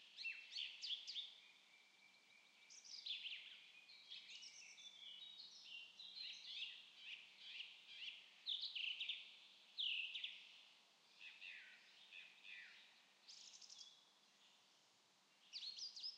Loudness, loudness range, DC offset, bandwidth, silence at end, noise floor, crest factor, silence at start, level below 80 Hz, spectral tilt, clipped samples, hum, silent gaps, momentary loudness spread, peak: -51 LUFS; 12 LU; under 0.1%; 10 kHz; 0 s; -76 dBFS; 22 dB; 0 s; under -90 dBFS; 3 dB/octave; under 0.1%; none; none; 21 LU; -34 dBFS